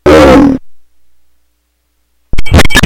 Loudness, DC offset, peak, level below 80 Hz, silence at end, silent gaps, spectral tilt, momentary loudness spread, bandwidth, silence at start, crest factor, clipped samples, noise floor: -6 LUFS; under 0.1%; 0 dBFS; -18 dBFS; 0 s; none; -5.5 dB/octave; 19 LU; 16.5 kHz; 0.05 s; 6 dB; 3%; -58 dBFS